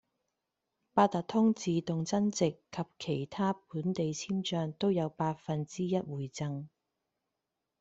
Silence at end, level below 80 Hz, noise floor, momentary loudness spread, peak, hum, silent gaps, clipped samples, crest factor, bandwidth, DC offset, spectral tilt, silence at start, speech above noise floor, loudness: 1.15 s; -70 dBFS; -87 dBFS; 10 LU; -10 dBFS; none; none; under 0.1%; 22 dB; 8 kHz; under 0.1%; -6 dB/octave; 0.95 s; 55 dB; -33 LUFS